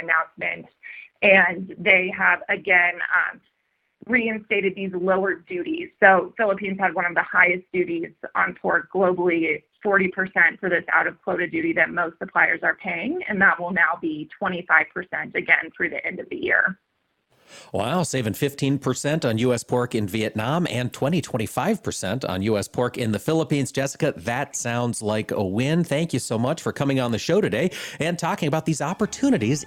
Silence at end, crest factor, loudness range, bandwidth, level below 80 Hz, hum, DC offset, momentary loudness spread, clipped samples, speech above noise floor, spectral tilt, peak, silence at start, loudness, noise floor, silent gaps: 0 s; 22 dB; 5 LU; 17 kHz; -60 dBFS; none; under 0.1%; 9 LU; under 0.1%; 50 dB; -5 dB/octave; 0 dBFS; 0 s; -22 LUFS; -72 dBFS; none